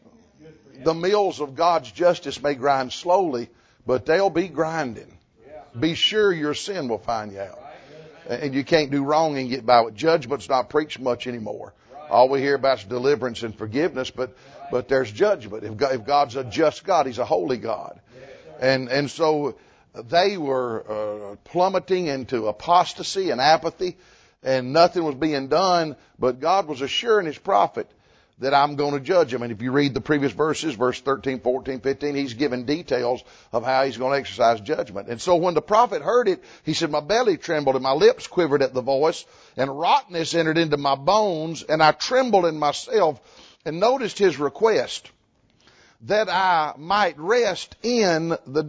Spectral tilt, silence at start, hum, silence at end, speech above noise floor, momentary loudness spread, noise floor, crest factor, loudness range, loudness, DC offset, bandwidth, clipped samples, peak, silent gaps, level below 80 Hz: -4.5 dB/octave; 0.45 s; none; 0 s; 40 dB; 11 LU; -62 dBFS; 20 dB; 3 LU; -22 LUFS; under 0.1%; 8 kHz; under 0.1%; -2 dBFS; none; -58 dBFS